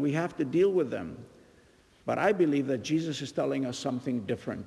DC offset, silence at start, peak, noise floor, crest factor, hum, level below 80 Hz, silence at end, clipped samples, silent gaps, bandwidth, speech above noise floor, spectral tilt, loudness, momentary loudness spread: under 0.1%; 0 s; -12 dBFS; -60 dBFS; 18 dB; none; -68 dBFS; 0 s; under 0.1%; none; 12 kHz; 31 dB; -6 dB/octave; -29 LUFS; 10 LU